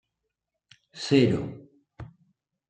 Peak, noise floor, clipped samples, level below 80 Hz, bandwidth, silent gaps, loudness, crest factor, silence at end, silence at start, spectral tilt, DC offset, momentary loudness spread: -8 dBFS; -83 dBFS; under 0.1%; -60 dBFS; 9.2 kHz; none; -24 LUFS; 22 dB; 0.6 s; 0.95 s; -6.5 dB/octave; under 0.1%; 25 LU